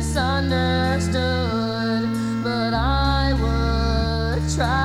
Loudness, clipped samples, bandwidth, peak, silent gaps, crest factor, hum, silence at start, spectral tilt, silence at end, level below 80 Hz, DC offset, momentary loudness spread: -21 LUFS; under 0.1%; 13 kHz; -8 dBFS; none; 12 dB; none; 0 s; -5.5 dB/octave; 0 s; -26 dBFS; under 0.1%; 3 LU